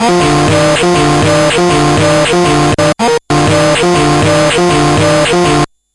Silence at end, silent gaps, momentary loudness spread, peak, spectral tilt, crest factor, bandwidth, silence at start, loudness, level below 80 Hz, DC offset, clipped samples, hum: 0.3 s; none; 2 LU; -2 dBFS; -4.5 dB/octave; 6 dB; 11.5 kHz; 0 s; -9 LUFS; -30 dBFS; under 0.1%; under 0.1%; none